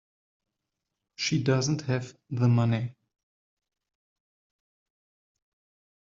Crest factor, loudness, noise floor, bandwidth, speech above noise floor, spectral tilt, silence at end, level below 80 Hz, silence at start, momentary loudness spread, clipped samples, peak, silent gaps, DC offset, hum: 20 dB; -27 LUFS; -85 dBFS; 7.6 kHz; 59 dB; -6 dB/octave; 3.1 s; -68 dBFS; 1.2 s; 9 LU; under 0.1%; -12 dBFS; none; under 0.1%; none